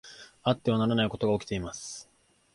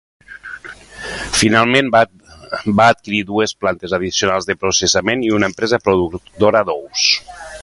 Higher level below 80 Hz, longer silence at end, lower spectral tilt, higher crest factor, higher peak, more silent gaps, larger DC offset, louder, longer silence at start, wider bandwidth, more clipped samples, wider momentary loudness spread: second, -54 dBFS vs -44 dBFS; first, 0.5 s vs 0 s; first, -5.5 dB/octave vs -3.5 dB/octave; about the same, 20 dB vs 16 dB; second, -10 dBFS vs 0 dBFS; neither; neither; second, -29 LUFS vs -15 LUFS; second, 0.05 s vs 0.3 s; about the same, 11.5 kHz vs 11.5 kHz; neither; second, 15 LU vs 18 LU